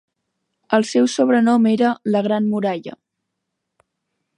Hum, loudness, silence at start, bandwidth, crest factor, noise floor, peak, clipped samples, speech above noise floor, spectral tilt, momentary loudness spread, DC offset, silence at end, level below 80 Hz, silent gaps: none; -18 LUFS; 0.7 s; 10.5 kHz; 18 dB; -78 dBFS; -2 dBFS; under 0.1%; 61 dB; -5.5 dB/octave; 8 LU; under 0.1%; 1.45 s; -72 dBFS; none